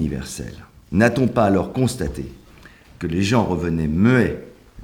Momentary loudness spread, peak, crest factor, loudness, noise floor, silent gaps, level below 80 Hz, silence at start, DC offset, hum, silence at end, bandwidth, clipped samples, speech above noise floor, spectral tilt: 16 LU; -2 dBFS; 20 dB; -20 LUFS; -46 dBFS; none; -40 dBFS; 0 s; under 0.1%; none; 0 s; 19 kHz; under 0.1%; 27 dB; -6.5 dB/octave